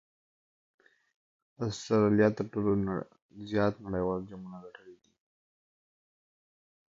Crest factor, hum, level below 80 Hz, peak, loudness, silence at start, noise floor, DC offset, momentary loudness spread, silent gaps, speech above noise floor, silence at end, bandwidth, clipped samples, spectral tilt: 22 dB; none; -60 dBFS; -12 dBFS; -30 LUFS; 1.6 s; under -90 dBFS; under 0.1%; 22 LU; 3.22-3.29 s; over 60 dB; 2 s; 7.8 kHz; under 0.1%; -7 dB/octave